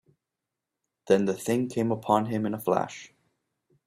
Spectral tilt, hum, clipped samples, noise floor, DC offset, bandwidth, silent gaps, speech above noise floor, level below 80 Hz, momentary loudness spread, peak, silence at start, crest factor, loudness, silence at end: -6.5 dB/octave; none; under 0.1%; -87 dBFS; under 0.1%; 16 kHz; none; 61 dB; -66 dBFS; 5 LU; -8 dBFS; 1.05 s; 22 dB; -27 LUFS; 0.8 s